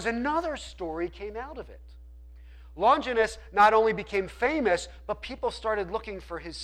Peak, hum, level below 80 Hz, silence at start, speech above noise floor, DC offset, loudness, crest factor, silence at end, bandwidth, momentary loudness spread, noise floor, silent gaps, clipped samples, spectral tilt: -10 dBFS; none; -48 dBFS; 0 s; 20 dB; under 0.1%; -27 LUFS; 18 dB; 0 s; 12.5 kHz; 16 LU; -47 dBFS; none; under 0.1%; -4.5 dB/octave